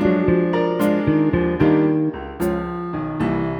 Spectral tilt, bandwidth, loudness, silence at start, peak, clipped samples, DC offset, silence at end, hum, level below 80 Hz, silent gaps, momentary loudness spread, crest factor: -8.5 dB/octave; over 20 kHz; -20 LUFS; 0 s; -2 dBFS; under 0.1%; under 0.1%; 0 s; none; -40 dBFS; none; 8 LU; 16 dB